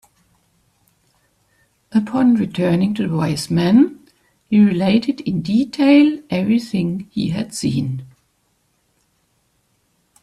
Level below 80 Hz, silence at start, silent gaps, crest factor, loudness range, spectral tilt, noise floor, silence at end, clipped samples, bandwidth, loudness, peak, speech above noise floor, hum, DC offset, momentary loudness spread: -56 dBFS; 1.9 s; none; 18 dB; 8 LU; -6.5 dB/octave; -65 dBFS; 2.15 s; under 0.1%; 13 kHz; -17 LUFS; -2 dBFS; 48 dB; none; under 0.1%; 9 LU